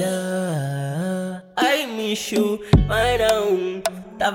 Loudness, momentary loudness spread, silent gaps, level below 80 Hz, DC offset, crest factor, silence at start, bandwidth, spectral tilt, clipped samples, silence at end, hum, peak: -21 LUFS; 8 LU; none; -34 dBFS; under 0.1%; 16 dB; 0 s; 17.5 kHz; -5 dB/octave; under 0.1%; 0 s; none; -4 dBFS